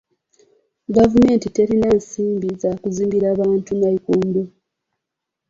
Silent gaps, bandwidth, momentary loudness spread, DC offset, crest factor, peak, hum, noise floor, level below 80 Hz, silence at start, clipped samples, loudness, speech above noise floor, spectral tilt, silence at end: none; 7.8 kHz; 8 LU; under 0.1%; 16 dB; -2 dBFS; none; -82 dBFS; -46 dBFS; 0.9 s; under 0.1%; -18 LUFS; 65 dB; -7.5 dB/octave; 1 s